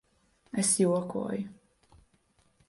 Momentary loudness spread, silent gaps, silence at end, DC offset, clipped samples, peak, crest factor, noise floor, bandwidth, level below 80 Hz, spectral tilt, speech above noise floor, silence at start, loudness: 13 LU; none; 1.15 s; under 0.1%; under 0.1%; -14 dBFS; 18 dB; -69 dBFS; 11.5 kHz; -68 dBFS; -4.5 dB/octave; 40 dB; 0.55 s; -29 LUFS